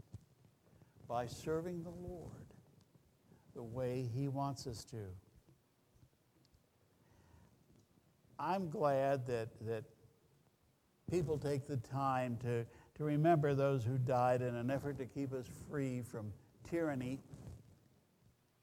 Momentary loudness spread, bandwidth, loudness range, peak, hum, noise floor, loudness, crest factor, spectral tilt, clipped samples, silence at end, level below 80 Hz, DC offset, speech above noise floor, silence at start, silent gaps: 20 LU; 16 kHz; 11 LU; -22 dBFS; none; -75 dBFS; -39 LUFS; 20 dB; -7.5 dB/octave; under 0.1%; 1.05 s; -68 dBFS; under 0.1%; 36 dB; 0.15 s; none